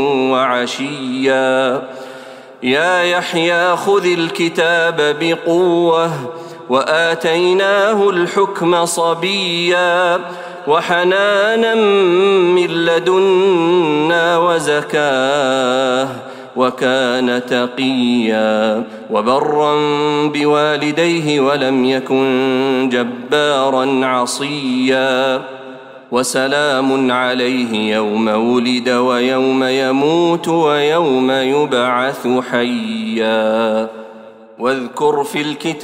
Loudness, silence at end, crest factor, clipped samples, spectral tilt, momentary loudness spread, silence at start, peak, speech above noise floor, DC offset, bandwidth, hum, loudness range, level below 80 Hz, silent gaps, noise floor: -14 LUFS; 0 s; 14 dB; under 0.1%; -4.5 dB/octave; 7 LU; 0 s; -2 dBFS; 23 dB; under 0.1%; 16 kHz; none; 3 LU; -66 dBFS; none; -37 dBFS